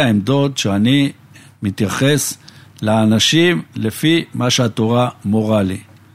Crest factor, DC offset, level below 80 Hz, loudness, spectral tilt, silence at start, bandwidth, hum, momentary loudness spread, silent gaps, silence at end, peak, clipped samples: 16 dB; under 0.1%; -54 dBFS; -16 LUFS; -5 dB/octave; 0 s; 16 kHz; none; 11 LU; none; 0.3 s; 0 dBFS; under 0.1%